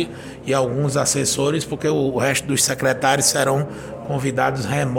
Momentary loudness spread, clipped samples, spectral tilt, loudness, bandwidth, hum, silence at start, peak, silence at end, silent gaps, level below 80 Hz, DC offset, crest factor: 9 LU; under 0.1%; -3.5 dB/octave; -19 LUFS; 17 kHz; none; 0 s; -4 dBFS; 0 s; none; -50 dBFS; under 0.1%; 16 dB